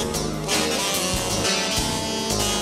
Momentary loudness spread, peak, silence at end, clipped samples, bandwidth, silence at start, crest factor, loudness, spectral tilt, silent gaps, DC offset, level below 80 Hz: 4 LU; -10 dBFS; 0 s; under 0.1%; 16.5 kHz; 0 s; 14 dB; -22 LUFS; -2.5 dB/octave; none; under 0.1%; -38 dBFS